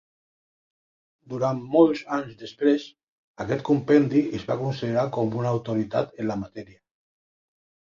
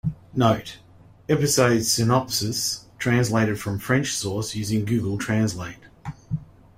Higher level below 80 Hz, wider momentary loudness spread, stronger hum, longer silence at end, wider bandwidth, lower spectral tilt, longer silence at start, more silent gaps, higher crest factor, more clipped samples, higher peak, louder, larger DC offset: second, -60 dBFS vs -50 dBFS; about the same, 16 LU vs 15 LU; neither; first, 1.25 s vs 0.35 s; second, 7.4 kHz vs 16 kHz; first, -8 dB/octave vs -4.5 dB/octave; first, 1.3 s vs 0.05 s; first, 3.08-3.34 s vs none; about the same, 20 dB vs 20 dB; neither; second, -6 dBFS vs -2 dBFS; about the same, -24 LUFS vs -23 LUFS; neither